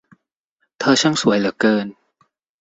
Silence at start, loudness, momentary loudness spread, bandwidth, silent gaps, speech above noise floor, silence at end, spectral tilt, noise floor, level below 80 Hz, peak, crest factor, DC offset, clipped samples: 0.8 s; -17 LUFS; 7 LU; 8.2 kHz; none; 55 dB; 0.7 s; -4 dB/octave; -72 dBFS; -60 dBFS; -2 dBFS; 18 dB; under 0.1%; under 0.1%